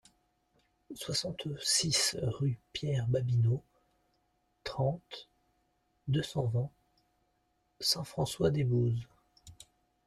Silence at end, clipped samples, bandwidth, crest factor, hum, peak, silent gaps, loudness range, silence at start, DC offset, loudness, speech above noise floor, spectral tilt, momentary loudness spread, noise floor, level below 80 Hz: 0.55 s; under 0.1%; 14 kHz; 20 dB; none; -14 dBFS; none; 6 LU; 0.9 s; under 0.1%; -32 LUFS; 44 dB; -4.5 dB/octave; 14 LU; -76 dBFS; -62 dBFS